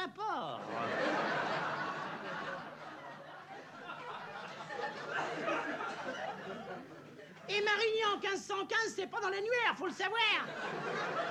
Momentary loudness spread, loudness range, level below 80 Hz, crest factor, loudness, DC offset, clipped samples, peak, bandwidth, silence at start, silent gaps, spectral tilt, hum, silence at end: 17 LU; 9 LU; -88 dBFS; 18 dB; -36 LUFS; under 0.1%; under 0.1%; -18 dBFS; 13.5 kHz; 0 s; none; -3 dB/octave; none; 0 s